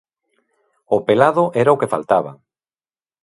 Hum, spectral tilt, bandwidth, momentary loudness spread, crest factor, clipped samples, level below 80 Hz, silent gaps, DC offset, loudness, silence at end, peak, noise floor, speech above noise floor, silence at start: none; -7 dB/octave; 11.5 kHz; 7 LU; 18 dB; under 0.1%; -62 dBFS; none; under 0.1%; -16 LUFS; 0.9 s; 0 dBFS; under -90 dBFS; over 74 dB; 0.9 s